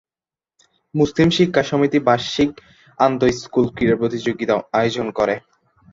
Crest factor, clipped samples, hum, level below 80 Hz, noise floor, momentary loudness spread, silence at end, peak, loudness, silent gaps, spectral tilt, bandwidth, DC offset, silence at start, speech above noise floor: 18 dB; under 0.1%; none; -48 dBFS; under -90 dBFS; 6 LU; 0.55 s; -2 dBFS; -19 LUFS; none; -6 dB/octave; 7.8 kHz; under 0.1%; 0.95 s; over 72 dB